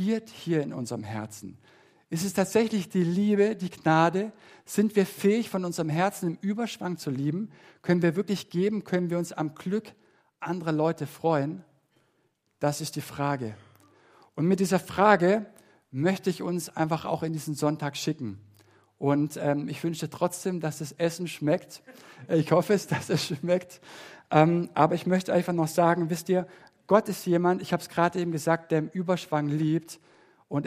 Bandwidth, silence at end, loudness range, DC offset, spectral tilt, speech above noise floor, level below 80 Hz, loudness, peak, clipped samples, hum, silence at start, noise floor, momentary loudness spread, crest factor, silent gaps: 15.5 kHz; 0 s; 5 LU; under 0.1%; -6 dB/octave; 45 dB; -70 dBFS; -27 LUFS; -4 dBFS; under 0.1%; none; 0 s; -72 dBFS; 12 LU; 24 dB; none